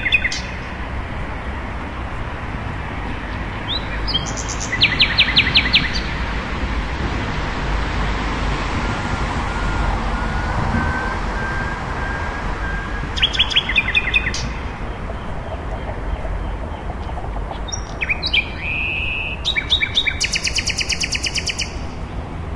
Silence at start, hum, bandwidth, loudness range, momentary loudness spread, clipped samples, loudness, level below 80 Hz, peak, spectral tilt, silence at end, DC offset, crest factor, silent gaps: 0 s; none; 11.5 kHz; 9 LU; 13 LU; under 0.1%; -20 LUFS; -28 dBFS; 0 dBFS; -3 dB/octave; 0 s; 0.5%; 20 dB; none